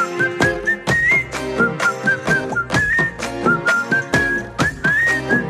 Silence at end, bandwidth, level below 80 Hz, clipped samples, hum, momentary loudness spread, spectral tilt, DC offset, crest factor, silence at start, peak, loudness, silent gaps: 0 s; 15 kHz; -40 dBFS; under 0.1%; none; 5 LU; -4.5 dB/octave; under 0.1%; 16 dB; 0 s; -2 dBFS; -17 LUFS; none